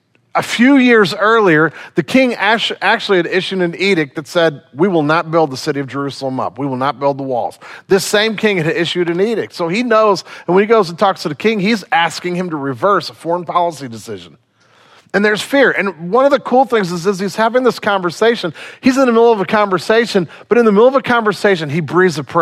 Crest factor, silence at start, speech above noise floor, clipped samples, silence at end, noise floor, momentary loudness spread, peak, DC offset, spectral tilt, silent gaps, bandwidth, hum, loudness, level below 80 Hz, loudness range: 14 dB; 0.35 s; 35 dB; under 0.1%; 0 s; -49 dBFS; 9 LU; 0 dBFS; under 0.1%; -5 dB/octave; none; 15.5 kHz; none; -14 LUFS; -62 dBFS; 5 LU